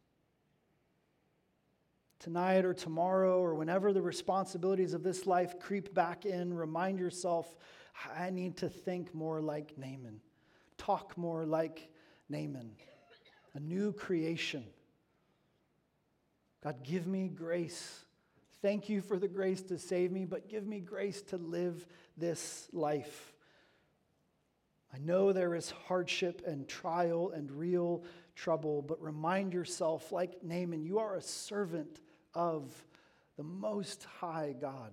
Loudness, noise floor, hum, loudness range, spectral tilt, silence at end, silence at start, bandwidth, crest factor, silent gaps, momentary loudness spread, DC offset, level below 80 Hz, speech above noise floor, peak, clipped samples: -37 LUFS; -78 dBFS; none; 8 LU; -5.5 dB/octave; 0 s; 2.2 s; 15 kHz; 22 dB; none; 14 LU; under 0.1%; -80 dBFS; 41 dB; -16 dBFS; under 0.1%